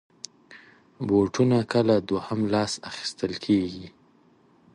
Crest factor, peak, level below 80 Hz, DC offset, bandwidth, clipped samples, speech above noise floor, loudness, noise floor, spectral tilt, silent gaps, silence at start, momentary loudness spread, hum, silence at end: 18 dB; -8 dBFS; -58 dBFS; under 0.1%; 11 kHz; under 0.1%; 35 dB; -25 LUFS; -59 dBFS; -6 dB/octave; none; 0.5 s; 18 LU; none; 0.85 s